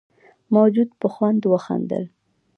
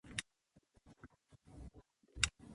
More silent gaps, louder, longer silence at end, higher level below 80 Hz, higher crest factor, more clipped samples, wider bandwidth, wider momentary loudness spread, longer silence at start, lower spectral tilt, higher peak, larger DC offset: neither; first, -20 LUFS vs -40 LUFS; first, 0.5 s vs 0 s; second, -70 dBFS vs -58 dBFS; second, 18 dB vs 34 dB; neither; second, 6.4 kHz vs 11.5 kHz; second, 11 LU vs 25 LU; first, 0.5 s vs 0.05 s; first, -9.5 dB/octave vs -1 dB/octave; first, -4 dBFS vs -14 dBFS; neither